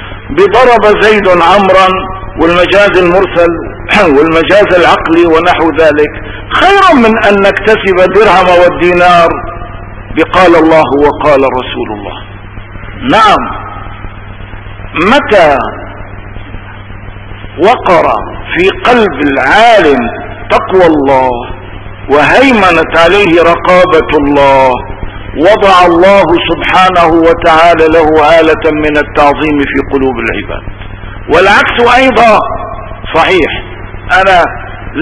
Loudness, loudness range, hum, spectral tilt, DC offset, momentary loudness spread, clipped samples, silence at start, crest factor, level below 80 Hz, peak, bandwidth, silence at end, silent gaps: -6 LUFS; 5 LU; none; -5.5 dB/octave; under 0.1%; 21 LU; 7%; 0 s; 6 dB; -26 dBFS; 0 dBFS; 11 kHz; 0 s; none